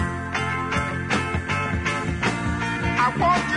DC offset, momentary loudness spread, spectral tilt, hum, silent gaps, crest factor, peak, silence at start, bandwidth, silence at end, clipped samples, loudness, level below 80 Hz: under 0.1%; 5 LU; -5 dB/octave; none; none; 16 dB; -8 dBFS; 0 s; 11 kHz; 0 s; under 0.1%; -23 LUFS; -40 dBFS